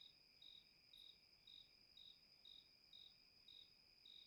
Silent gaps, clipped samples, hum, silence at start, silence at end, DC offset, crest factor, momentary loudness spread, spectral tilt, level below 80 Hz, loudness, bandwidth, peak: none; under 0.1%; none; 0 s; 0 s; under 0.1%; 16 dB; 3 LU; -1.5 dB/octave; -90 dBFS; -65 LUFS; 11.5 kHz; -52 dBFS